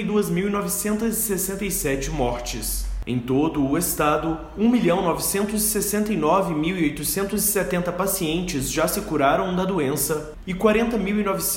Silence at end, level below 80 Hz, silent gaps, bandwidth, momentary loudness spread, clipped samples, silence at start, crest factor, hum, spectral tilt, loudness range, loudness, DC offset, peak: 0 s; -38 dBFS; none; 16.5 kHz; 5 LU; under 0.1%; 0 s; 18 dB; none; -4.5 dB/octave; 3 LU; -22 LUFS; under 0.1%; -6 dBFS